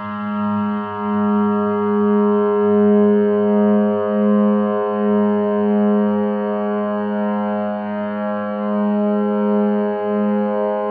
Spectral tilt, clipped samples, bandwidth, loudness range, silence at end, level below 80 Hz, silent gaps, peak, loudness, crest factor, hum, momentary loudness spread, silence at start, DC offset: -12.5 dB/octave; under 0.1%; 3.3 kHz; 4 LU; 0 s; -68 dBFS; none; -4 dBFS; -18 LUFS; 12 dB; none; 7 LU; 0 s; under 0.1%